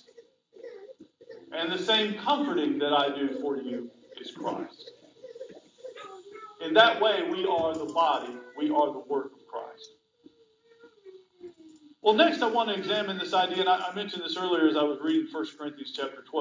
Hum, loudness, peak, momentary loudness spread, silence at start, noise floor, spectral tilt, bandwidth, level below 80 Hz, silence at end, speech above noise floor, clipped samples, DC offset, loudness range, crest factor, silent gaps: none; -27 LUFS; -6 dBFS; 23 LU; 0.2 s; -62 dBFS; -4.5 dB/octave; 7.6 kHz; -74 dBFS; 0 s; 35 dB; under 0.1%; under 0.1%; 8 LU; 22 dB; none